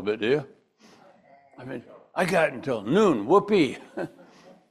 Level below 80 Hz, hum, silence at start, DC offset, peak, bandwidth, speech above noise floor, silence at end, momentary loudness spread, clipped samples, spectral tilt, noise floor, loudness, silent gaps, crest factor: -66 dBFS; none; 0 s; under 0.1%; -6 dBFS; 13.5 kHz; 32 dB; 0.65 s; 19 LU; under 0.1%; -6 dB/octave; -56 dBFS; -24 LUFS; none; 20 dB